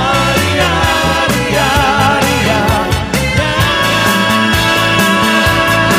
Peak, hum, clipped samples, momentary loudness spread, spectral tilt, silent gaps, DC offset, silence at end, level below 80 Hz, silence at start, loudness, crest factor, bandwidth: 0 dBFS; none; under 0.1%; 3 LU; -4 dB/octave; none; under 0.1%; 0 s; -26 dBFS; 0 s; -11 LUFS; 12 dB; 16 kHz